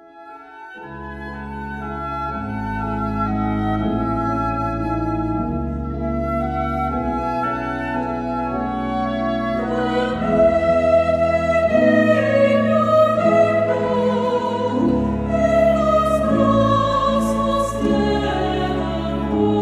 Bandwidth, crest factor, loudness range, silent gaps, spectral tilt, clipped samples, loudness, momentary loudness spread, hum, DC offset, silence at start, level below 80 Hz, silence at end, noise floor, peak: 12.5 kHz; 14 dB; 7 LU; none; -7 dB/octave; under 0.1%; -19 LUFS; 10 LU; none; under 0.1%; 0.15 s; -34 dBFS; 0 s; -40 dBFS; -4 dBFS